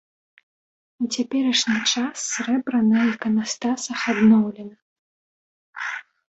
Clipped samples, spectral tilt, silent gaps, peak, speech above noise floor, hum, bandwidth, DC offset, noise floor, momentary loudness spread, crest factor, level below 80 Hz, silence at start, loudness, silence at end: under 0.1%; -3.5 dB/octave; 4.82-5.73 s; -6 dBFS; over 69 dB; none; 8.2 kHz; under 0.1%; under -90 dBFS; 13 LU; 16 dB; -66 dBFS; 1 s; -21 LUFS; 0.3 s